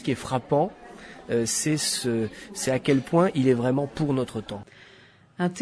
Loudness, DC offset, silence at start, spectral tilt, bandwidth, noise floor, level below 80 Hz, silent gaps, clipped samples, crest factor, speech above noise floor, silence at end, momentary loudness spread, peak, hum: -25 LUFS; under 0.1%; 0 s; -5 dB/octave; 11 kHz; -54 dBFS; -58 dBFS; none; under 0.1%; 18 dB; 29 dB; 0 s; 14 LU; -8 dBFS; none